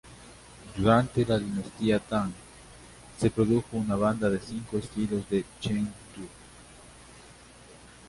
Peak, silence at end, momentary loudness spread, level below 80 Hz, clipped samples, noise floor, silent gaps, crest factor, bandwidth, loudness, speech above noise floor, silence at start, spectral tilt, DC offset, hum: -8 dBFS; 0 s; 25 LU; -52 dBFS; under 0.1%; -51 dBFS; none; 22 dB; 11.5 kHz; -28 LUFS; 24 dB; 0.05 s; -6.5 dB/octave; under 0.1%; none